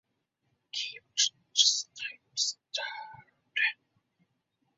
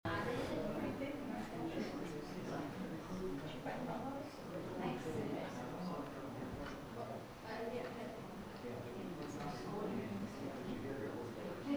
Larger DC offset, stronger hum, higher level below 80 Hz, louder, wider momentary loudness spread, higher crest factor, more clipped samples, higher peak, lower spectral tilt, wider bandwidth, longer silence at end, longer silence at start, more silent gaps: neither; neither; second, -88 dBFS vs -62 dBFS; first, -29 LUFS vs -45 LUFS; first, 16 LU vs 6 LU; first, 26 dB vs 16 dB; neither; first, -8 dBFS vs -28 dBFS; second, 4 dB/octave vs -6 dB/octave; second, 8 kHz vs over 20 kHz; first, 1.05 s vs 0 s; first, 0.75 s vs 0.05 s; neither